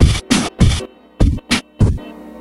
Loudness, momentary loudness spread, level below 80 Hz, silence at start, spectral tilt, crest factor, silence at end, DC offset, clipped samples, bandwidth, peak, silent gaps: -17 LUFS; 13 LU; -20 dBFS; 0 s; -5 dB/octave; 16 dB; 0 s; under 0.1%; under 0.1%; 13 kHz; 0 dBFS; none